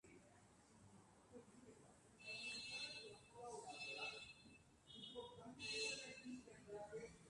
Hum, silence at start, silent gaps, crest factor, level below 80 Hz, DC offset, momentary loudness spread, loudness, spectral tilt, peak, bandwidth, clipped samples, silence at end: none; 0.05 s; none; 20 dB; -80 dBFS; under 0.1%; 20 LU; -52 LUFS; -2 dB/octave; -36 dBFS; 11.5 kHz; under 0.1%; 0 s